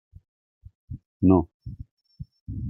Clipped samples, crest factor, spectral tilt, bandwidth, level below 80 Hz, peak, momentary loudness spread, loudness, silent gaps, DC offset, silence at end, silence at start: under 0.1%; 22 dB; -14 dB/octave; 5.8 kHz; -48 dBFS; -6 dBFS; 25 LU; -22 LUFS; 1.06-1.20 s, 1.54-1.60 s, 1.91-1.97 s, 2.41-2.46 s; under 0.1%; 0 s; 0.9 s